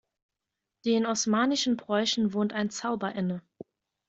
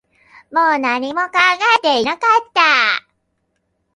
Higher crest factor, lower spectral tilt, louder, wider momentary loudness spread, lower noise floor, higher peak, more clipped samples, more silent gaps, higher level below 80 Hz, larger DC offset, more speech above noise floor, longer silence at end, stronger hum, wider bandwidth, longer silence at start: about the same, 16 dB vs 16 dB; first, -4 dB/octave vs -1.5 dB/octave; second, -28 LUFS vs -14 LUFS; about the same, 8 LU vs 7 LU; first, -87 dBFS vs -69 dBFS; second, -12 dBFS vs 0 dBFS; neither; neither; second, -70 dBFS vs -64 dBFS; neither; first, 59 dB vs 54 dB; second, 0.7 s vs 0.95 s; neither; second, 8 kHz vs 11.5 kHz; first, 0.85 s vs 0.5 s